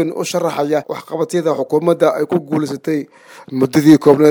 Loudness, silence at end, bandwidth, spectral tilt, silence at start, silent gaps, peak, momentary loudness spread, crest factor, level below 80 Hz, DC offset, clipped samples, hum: -15 LUFS; 0 s; 19.5 kHz; -6.5 dB/octave; 0 s; none; 0 dBFS; 12 LU; 14 dB; -60 dBFS; under 0.1%; under 0.1%; none